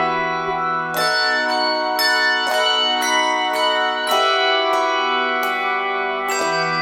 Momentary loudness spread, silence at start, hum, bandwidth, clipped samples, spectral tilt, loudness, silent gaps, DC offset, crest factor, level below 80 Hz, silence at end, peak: 5 LU; 0 s; none; 18 kHz; under 0.1%; -1.5 dB/octave; -18 LUFS; none; under 0.1%; 14 dB; -60 dBFS; 0 s; -6 dBFS